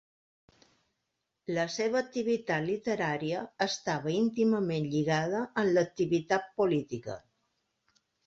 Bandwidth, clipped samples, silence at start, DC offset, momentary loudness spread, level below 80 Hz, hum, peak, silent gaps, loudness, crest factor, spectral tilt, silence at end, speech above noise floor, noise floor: 8 kHz; under 0.1%; 1.5 s; under 0.1%; 7 LU; -70 dBFS; none; -12 dBFS; none; -30 LUFS; 20 dB; -5.5 dB/octave; 1.1 s; 53 dB; -83 dBFS